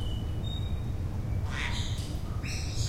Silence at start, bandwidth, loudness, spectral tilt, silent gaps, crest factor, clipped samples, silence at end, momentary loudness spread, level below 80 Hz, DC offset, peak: 0 s; 16 kHz; -34 LUFS; -5 dB/octave; none; 14 dB; under 0.1%; 0 s; 3 LU; -36 dBFS; under 0.1%; -18 dBFS